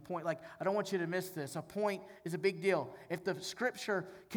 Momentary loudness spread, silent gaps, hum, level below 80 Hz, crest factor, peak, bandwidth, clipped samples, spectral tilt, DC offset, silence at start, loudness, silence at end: 7 LU; none; none; -78 dBFS; 18 dB; -20 dBFS; over 20 kHz; under 0.1%; -5 dB/octave; under 0.1%; 0 s; -37 LUFS; 0 s